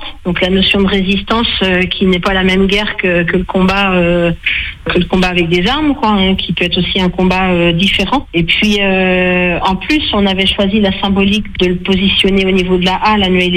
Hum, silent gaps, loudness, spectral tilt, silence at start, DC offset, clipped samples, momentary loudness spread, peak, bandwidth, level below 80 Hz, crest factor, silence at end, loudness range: none; none; -11 LUFS; -6 dB/octave; 0 s; under 0.1%; under 0.1%; 3 LU; 0 dBFS; 10 kHz; -28 dBFS; 12 dB; 0 s; 1 LU